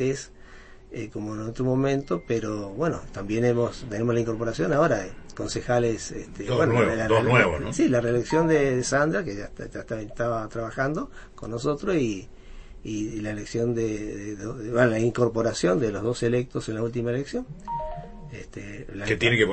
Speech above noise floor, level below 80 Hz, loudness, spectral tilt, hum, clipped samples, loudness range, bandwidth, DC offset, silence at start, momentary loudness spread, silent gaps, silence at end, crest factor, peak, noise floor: 21 dB; -44 dBFS; -26 LUFS; -6 dB/octave; none; under 0.1%; 7 LU; 8.8 kHz; under 0.1%; 0 s; 15 LU; none; 0 s; 22 dB; -4 dBFS; -46 dBFS